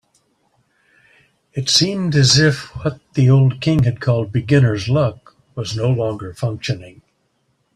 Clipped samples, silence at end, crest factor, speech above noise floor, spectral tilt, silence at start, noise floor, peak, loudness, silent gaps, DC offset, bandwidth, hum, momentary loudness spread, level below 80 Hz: under 0.1%; 0.85 s; 16 dB; 49 dB; -5 dB/octave; 1.55 s; -65 dBFS; -2 dBFS; -17 LUFS; none; under 0.1%; 11.5 kHz; none; 12 LU; -46 dBFS